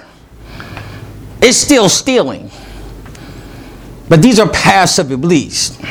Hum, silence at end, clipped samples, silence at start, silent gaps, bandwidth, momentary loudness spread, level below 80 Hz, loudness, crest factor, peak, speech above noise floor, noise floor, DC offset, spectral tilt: none; 0 s; 0.5%; 0.45 s; none; over 20 kHz; 24 LU; -36 dBFS; -10 LUFS; 12 dB; 0 dBFS; 27 dB; -36 dBFS; under 0.1%; -4 dB/octave